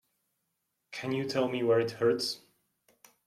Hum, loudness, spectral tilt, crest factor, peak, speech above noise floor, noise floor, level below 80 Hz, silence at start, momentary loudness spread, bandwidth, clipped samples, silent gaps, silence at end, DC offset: none; -30 LUFS; -5 dB/octave; 18 dB; -16 dBFS; 52 dB; -81 dBFS; -76 dBFS; 0.9 s; 13 LU; 14.5 kHz; under 0.1%; none; 0.9 s; under 0.1%